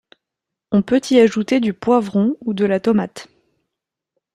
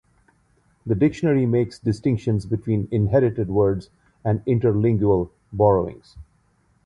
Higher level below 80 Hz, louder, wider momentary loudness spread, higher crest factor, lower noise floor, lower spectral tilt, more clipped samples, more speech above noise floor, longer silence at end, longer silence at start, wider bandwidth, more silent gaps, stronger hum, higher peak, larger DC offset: second, -58 dBFS vs -44 dBFS; first, -17 LUFS vs -21 LUFS; about the same, 6 LU vs 8 LU; about the same, 18 dB vs 18 dB; first, -83 dBFS vs -62 dBFS; second, -6.5 dB/octave vs -9.5 dB/octave; neither; first, 67 dB vs 42 dB; first, 1.1 s vs 0.65 s; second, 0.7 s vs 0.85 s; about the same, 11 kHz vs 10 kHz; neither; neither; about the same, -2 dBFS vs -4 dBFS; neither